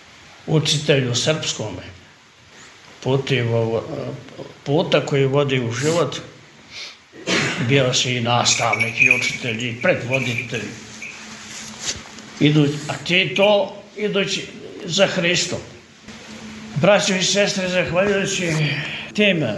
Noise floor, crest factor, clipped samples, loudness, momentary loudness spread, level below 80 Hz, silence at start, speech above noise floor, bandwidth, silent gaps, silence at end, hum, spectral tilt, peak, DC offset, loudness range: -48 dBFS; 20 dB; under 0.1%; -19 LUFS; 18 LU; -56 dBFS; 0.25 s; 29 dB; 11.5 kHz; none; 0 s; none; -4 dB/octave; 0 dBFS; under 0.1%; 5 LU